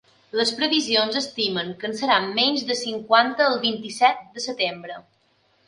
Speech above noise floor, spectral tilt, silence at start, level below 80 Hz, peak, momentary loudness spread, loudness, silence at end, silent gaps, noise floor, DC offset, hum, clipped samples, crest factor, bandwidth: 41 dB; -2.5 dB/octave; 0.35 s; -70 dBFS; 0 dBFS; 11 LU; -22 LUFS; 0.65 s; none; -64 dBFS; under 0.1%; none; under 0.1%; 22 dB; 11.5 kHz